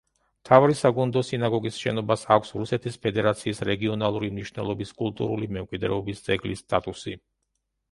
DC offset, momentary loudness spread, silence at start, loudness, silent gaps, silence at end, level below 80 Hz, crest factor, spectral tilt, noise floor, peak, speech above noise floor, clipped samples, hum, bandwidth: under 0.1%; 11 LU; 0.45 s; -25 LUFS; none; 0.75 s; -54 dBFS; 24 dB; -6 dB/octave; -78 dBFS; 0 dBFS; 53 dB; under 0.1%; none; 11.5 kHz